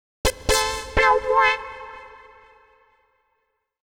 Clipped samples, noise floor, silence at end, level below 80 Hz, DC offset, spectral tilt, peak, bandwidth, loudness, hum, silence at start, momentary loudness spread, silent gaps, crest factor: under 0.1%; -73 dBFS; 1.75 s; -36 dBFS; under 0.1%; -2 dB/octave; -8 dBFS; 20 kHz; -20 LUFS; none; 0.25 s; 21 LU; none; 16 dB